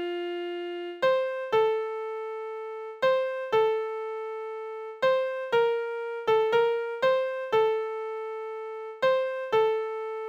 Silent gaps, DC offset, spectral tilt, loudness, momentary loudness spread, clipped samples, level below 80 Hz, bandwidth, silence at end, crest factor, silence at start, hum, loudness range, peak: none; under 0.1%; -4.5 dB/octave; -28 LUFS; 11 LU; under 0.1%; -74 dBFS; 8 kHz; 0 s; 16 dB; 0 s; none; 3 LU; -12 dBFS